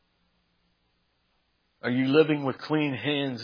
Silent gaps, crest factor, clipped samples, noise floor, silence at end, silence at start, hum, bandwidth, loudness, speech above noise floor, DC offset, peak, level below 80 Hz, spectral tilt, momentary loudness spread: none; 22 dB; under 0.1%; -72 dBFS; 0 s; 1.85 s; none; 5.2 kHz; -26 LUFS; 47 dB; under 0.1%; -6 dBFS; -78 dBFS; -8 dB/octave; 7 LU